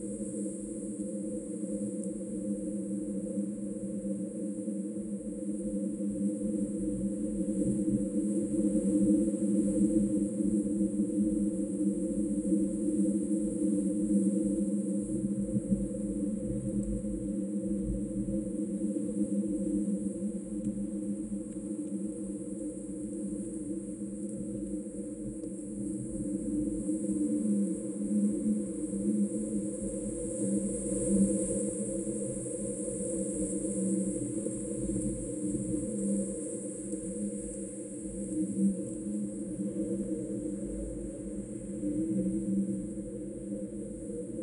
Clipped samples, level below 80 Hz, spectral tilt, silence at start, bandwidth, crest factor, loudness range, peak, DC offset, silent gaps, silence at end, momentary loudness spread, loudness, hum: under 0.1%; -52 dBFS; -8 dB/octave; 0 s; 11 kHz; 18 dB; 7 LU; -16 dBFS; under 0.1%; none; 0 s; 9 LU; -33 LUFS; none